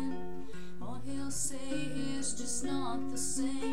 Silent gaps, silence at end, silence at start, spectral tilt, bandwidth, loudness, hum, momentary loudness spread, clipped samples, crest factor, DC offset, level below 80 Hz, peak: none; 0 s; 0 s; -3.5 dB/octave; 16 kHz; -37 LUFS; none; 11 LU; under 0.1%; 14 dB; 2%; -56 dBFS; -20 dBFS